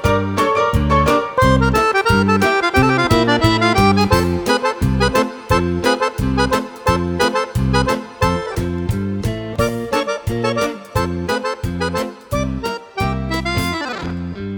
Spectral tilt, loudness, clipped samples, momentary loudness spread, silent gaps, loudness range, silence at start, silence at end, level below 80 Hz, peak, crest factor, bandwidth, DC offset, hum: -5.5 dB/octave; -17 LUFS; under 0.1%; 9 LU; none; 7 LU; 0 s; 0 s; -30 dBFS; 0 dBFS; 16 dB; over 20 kHz; under 0.1%; none